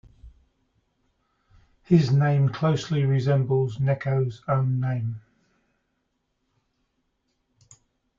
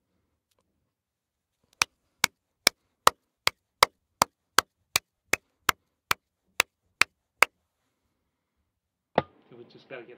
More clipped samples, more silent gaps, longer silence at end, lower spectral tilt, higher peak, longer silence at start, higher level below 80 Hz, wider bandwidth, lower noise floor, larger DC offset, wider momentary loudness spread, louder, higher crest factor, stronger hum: neither; neither; first, 3 s vs 0.2 s; first, -8 dB/octave vs -0.5 dB/octave; second, -6 dBFS vs 0 dBFS; second, 0.25 s vs 1.8 s; first, -58 dBFS vs -64 dBFS; second, 7.4 kHz vs 16 kHz; second, -75 dBFS vs -85 dBFS; neither; about the same, 7 LU vs 7 LU; first, -24 LUFS vs -27 LUFS; second, 20 dB vs 32 dB; neither